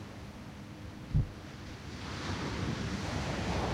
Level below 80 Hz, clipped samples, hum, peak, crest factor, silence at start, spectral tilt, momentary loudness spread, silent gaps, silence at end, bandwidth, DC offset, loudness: -44 dBFS; under 0.1%; none; -18 dBFS; 20 dB; 0 s; -5.5 dB/octave; 12 LU; none; 0 s; 15.5 kHz; under 0.1%; -38 LUFS